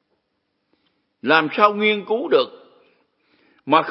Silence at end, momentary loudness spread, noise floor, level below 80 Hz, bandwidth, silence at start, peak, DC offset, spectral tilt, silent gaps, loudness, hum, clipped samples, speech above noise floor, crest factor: 0 s; 13 LU; -72 dBFS; -80 dBFS; 5.8 kHz; 1.25 s; 0 dBFS; under 0.1%; -9 dB/octave; none; -19 LUFS; none; under 0.1%; 55 dB; 22 dB